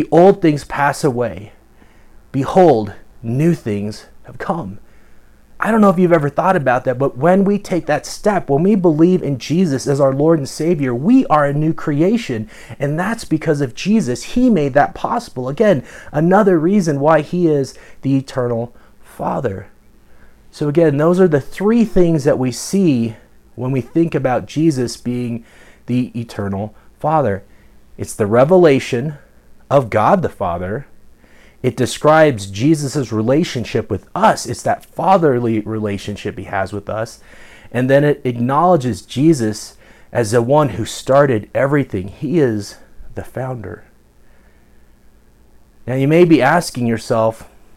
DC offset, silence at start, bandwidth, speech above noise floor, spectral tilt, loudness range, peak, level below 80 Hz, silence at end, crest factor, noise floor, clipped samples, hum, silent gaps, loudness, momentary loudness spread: under 0.1%; 0 s; 15.5 kHz; 32 dB; -6.5 dB/octave; 5 LU; 0 dBFS; -44 dBFS; 0.35 s; 16 dB; -47 dBFS; under 0.1%; none; none; -16 LUFS; 13 LU